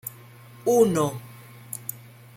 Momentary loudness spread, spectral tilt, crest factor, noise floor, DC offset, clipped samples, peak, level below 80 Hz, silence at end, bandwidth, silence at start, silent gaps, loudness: 22 LU; -6 dB/octave; 20 dB; -47 dBFS; under 0.1%; under 0.1%; -6 dBFS; -62 dBFS; 0.4 s; 16.5 kHz; 0.05 s; none; -24 LUFS